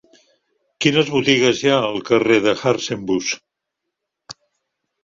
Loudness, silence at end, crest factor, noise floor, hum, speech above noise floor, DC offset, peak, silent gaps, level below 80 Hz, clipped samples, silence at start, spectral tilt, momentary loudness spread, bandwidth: -17 LUFS; 0.7 s; 18 dB; -80 dBFS; none; 63 dB; under 0.1%; -2 dBFS; none; -58 dBFS; under 0.1%; 0.8 s; -4 dB/octave; 7 LU; 7.6 kHz